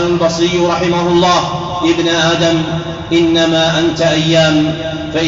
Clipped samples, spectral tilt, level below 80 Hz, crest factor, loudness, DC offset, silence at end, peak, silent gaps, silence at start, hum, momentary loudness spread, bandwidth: under 0.1%; -4 dB/octave; -38 dBFS; 10 dB; -12 LUFS; 0.1%; 0 s; -2 dBFS; none; 0 s; none; 7 LU; 7.8 kHz